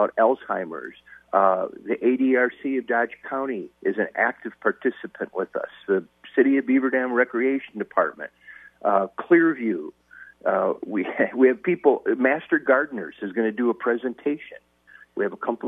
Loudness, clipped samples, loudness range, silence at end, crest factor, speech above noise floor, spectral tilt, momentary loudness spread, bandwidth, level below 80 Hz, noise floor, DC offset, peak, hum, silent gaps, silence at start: -23 LUFS; under 0.1%; 3 LU; 0 s; 20 dB; 30 dB; -8.5 dB/octave; 11 LU; 3.8 kHz; -72 dBFS; -53 dBFS; under 0.1%; -4 dBFS; none; none; 0 s